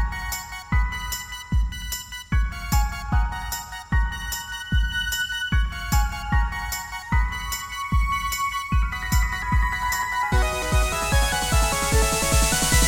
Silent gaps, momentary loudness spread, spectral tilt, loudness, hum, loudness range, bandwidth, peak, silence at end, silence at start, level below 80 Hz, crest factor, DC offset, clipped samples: none; 9 LU; -3.5 dB/octave; -24 LUFS; none; 4 LU; 17 kHz; -6 dBFS; 0 s; 0 s; -26 dBFS; 16 dB; 0.3%; under 0.1%